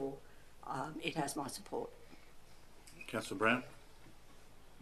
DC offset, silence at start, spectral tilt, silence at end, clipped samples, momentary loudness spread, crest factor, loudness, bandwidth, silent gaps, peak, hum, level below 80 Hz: under 0.1%; 0 s; -4 dB/octave; 0 s; under 0.1%; 27 LU; 24 dB; -39 LUFS; 14 kHz; none; -18 dBFS; none; -64 dBFS